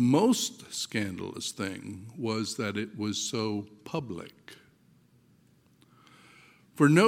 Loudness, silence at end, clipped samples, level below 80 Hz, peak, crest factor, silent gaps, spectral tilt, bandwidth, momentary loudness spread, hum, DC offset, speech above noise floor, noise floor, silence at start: -31 LUFS; 0 s; under 0.1%; -72 dBFS; -8 dBFS; 22 dB; none; -5 dB/octave; 17 kHz; 18 LU; none; under 0.1%; 34 dB; -63 dBFS; 0 s